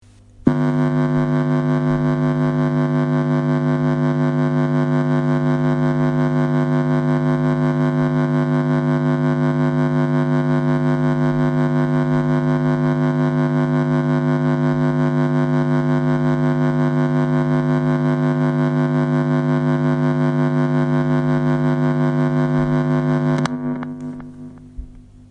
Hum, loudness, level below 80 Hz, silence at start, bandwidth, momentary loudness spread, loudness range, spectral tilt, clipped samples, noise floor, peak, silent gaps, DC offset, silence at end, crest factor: 50 Hz at -20 dBFS; -18 LUFS; -46 dBFS; 0.4 s; 6.6 kHz; 1 LU; 0 LU; -9 dB/octave; under 0.1%; -39 dBFS; 0 dBFS; none; under 0.1%; 0.3 s; 16 dB